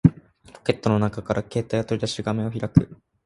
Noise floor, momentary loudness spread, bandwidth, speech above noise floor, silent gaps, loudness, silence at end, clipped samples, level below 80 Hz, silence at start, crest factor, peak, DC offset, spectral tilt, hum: -49 dBFS; 6 LU; 11.5 kHz; 26 dB; none; -24 LUFS; 0.3 s; under 0.1%; -44 dBFS; 0.05 s; 22 dB; 0 dBFS; under 0.1%; -7 dB/octave; none